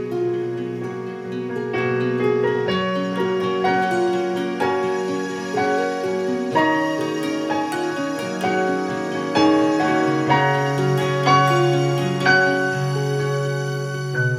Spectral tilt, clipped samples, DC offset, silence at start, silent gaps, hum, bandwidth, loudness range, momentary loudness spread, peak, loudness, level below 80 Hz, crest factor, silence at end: -6 dB/octave; under 0.1%; under 0.1%; 0 s; none; none; 13.5 kHz; 4 LU; 8 LU; -2 dBFS; -20 LUFS; -64 dBFS; 18 dB; 0 s